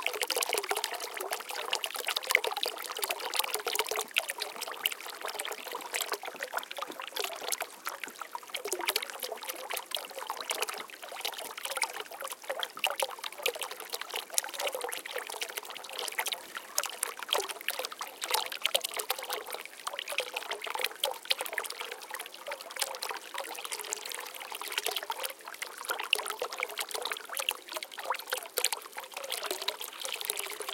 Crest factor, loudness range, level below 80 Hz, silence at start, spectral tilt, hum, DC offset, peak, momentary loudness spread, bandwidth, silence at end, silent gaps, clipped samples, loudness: 34 dB; 5 LU; -86 dBFS; 0 s; 2 dB/octave; none; under 0.1%; -2 dBFS; 9 LU; 17 kHz; 0 s; none; under 0.1%; -34 LUFS